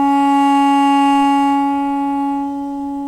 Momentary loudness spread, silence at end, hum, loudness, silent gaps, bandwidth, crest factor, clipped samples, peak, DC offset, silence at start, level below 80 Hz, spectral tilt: 9 LU; 0 s; none; -15 LUFS; none; 11.5 kHz; 10 dB; under 0.1%; -6 dBFS; under 0.1%; 0 s; -50 dBFS; -3.5 dB/octave